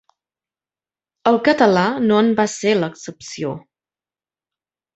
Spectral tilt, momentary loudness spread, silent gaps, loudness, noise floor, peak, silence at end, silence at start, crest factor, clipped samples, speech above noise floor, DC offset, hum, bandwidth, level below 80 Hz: -5 dB/octave; 15 LU; none; -17 LUFS; under -90 dBFS; -2 dBFS; 1.35 s; 1.25 s; 18 dB; under 0.1%; over 73 dB; under 0.1%; none; 8.2 kHz; -62 dBFS